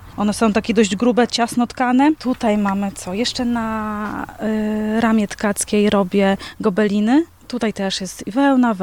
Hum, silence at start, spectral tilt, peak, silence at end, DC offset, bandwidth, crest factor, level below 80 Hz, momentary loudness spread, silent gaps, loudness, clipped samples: none; 0 s; -5 dB/octave; -2 dBFS; 0 s; 0.2%; 16 kHz; 16 dB; -46 dBFS; 8 LU; none; -18 LUFS; under 0.1%